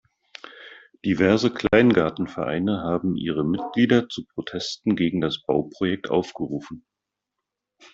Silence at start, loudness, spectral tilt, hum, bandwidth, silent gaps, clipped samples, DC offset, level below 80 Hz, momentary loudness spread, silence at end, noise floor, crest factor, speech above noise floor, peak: 0.45 s; -23 LUFS; -6.5 dB/octave; none; 7.8 kHz; none; under 0.1%; under 0.1%; -54 dBFS; 18 LU; 1.15 s; -85 dBFS; 20 dB; 63 dB; -2 dBFS